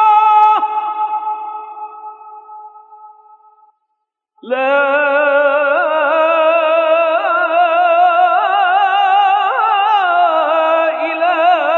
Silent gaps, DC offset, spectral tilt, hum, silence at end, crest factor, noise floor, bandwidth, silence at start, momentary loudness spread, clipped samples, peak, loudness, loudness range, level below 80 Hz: none; under 0.1%; -2.5 dB/octave; none; 0 s; 12 dB; -72 dBFS; 6.4 kHz; 0 s; 11 LU; under 0.1%; -2 dBFS; -12 LUFS; 14 LU; -82 dBFS